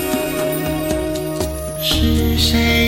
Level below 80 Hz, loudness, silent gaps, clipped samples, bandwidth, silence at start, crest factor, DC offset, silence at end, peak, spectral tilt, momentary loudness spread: -24 dBFS; -18 LUFS; none; under 0.1%; 16.5 kHz; 0 s; 14 dB; under 0.1%; 0 s; -2 dBFS; -4.5 dB/octave; 8 LU